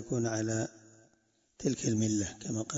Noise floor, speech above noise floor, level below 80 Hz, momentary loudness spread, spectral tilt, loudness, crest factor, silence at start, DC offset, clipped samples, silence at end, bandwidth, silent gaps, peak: -72 dBFS; 40 dB; -64 dBFS; 6 LU; -5 dB/octave; -33 LUFS; 18 dB; 0 s; under 0.1%; under 0.1%; 0 s; 8 kHz; none; -16 dBFS